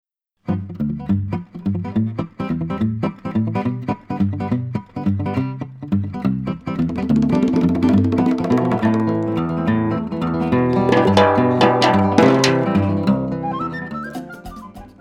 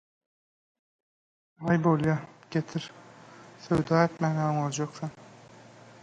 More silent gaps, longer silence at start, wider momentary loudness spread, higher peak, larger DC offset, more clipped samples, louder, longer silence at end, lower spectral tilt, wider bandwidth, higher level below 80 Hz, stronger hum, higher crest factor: neither; second, 0.45 s vs 1.6 s; about the same, 13 LU vs 15 LU; first, 0 dBFS vs -10 dBFS; neither; neither; first, -19 LUFS vs -28 LUFS; second, 0.1 s vs 0.8 s; about the same, -7 dB/octave vs -6.5 dB/octave; first, 12 kHz vs 9.2 kHz; first, -46 dBFS vs -60 dBFS; neither; about the same, 18 dB vs 20 dB